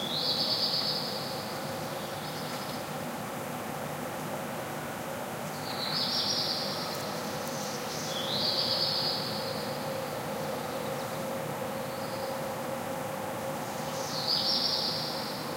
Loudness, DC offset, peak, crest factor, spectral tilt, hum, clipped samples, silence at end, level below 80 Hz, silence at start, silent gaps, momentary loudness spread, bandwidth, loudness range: -31 LUFS; under 0.1%; -16 dBFS; 18 dB; -3 dB/octave; none; under 0.1%; 0 s; -66 dBFS; 0 s; none; 10 LU; 16 kHz; 6 LU